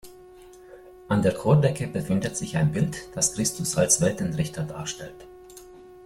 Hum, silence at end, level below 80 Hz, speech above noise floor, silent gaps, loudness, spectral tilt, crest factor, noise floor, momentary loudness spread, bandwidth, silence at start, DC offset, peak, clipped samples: none; 0 s; -52 dBFS; 23 dB; none; -24 LUFS; -5 dB/octave; 20 dB; -48 dBFS; 19 LU; 15.5 kHz; 0.05 s; under 0.1%; -6 dBFS; under 0.1%